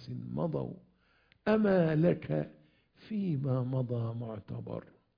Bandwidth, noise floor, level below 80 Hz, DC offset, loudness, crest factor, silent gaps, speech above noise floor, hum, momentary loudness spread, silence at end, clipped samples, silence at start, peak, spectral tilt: 5.2 kHz; -68 dBFS; -64 dBFS; under 0.1%; -33 LUFS; 18 dB; none; 37 dB; none; 16 LU; 0.35 s; under 0.1%; 0 s; -14 dBFS; -10.5 dB/octave